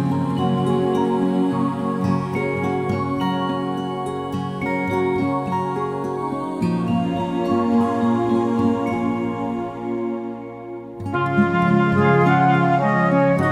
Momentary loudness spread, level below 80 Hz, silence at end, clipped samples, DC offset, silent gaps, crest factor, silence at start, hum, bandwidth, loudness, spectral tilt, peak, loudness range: 9 LU; -52 dBFS; 0 s; under 0.1%; under 0.1%; none; 16 dB; 0 s; none; 12 kHz; -20 LUFS; -8 dB/octave; -4 dBFS; 4 LU